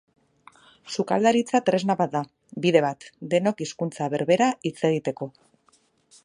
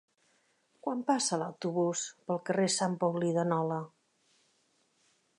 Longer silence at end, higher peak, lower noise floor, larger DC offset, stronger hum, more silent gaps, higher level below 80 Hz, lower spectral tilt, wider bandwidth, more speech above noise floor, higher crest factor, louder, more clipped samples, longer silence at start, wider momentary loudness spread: second, 0.95 s vs 1.5 s; first, -4 dBFS vs -16 dBFS; second, -64 dBFS vs -73 dBFS; neither; neither; neither; first, -72 dBFS vs -84 dBFS; about the same, -5.5 dB/octave vs -4.5 dB/octave; about the same, 11 kHz vs 11 kHz; about the same, 40 dB vs 41 dB; about the same, 22 dB vs 18 dB; first, -24 LUFS vs -32 LUFS; neither; about the same, 0.85 s vs 0.85 s; first, 11 LU vs 8 LU